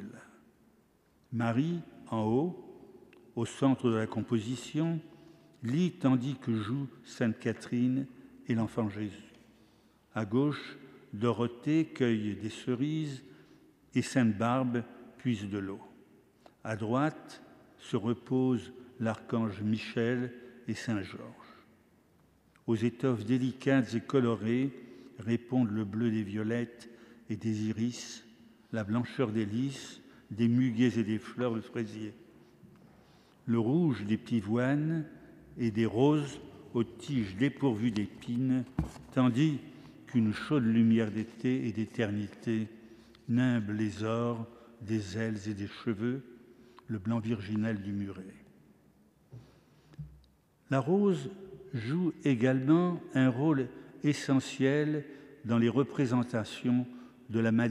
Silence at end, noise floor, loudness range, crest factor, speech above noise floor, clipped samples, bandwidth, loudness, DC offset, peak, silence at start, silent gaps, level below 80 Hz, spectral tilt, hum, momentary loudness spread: 0 s; -67 dBFS; 6 LU; 20 dB; 37 dB; under 0.1%; 11.5 kHz; -32 LUFS; under 0.1%; -12 dBFS; 0 s; none; -64 dBFS; -7 dB/octave; none; 16 LU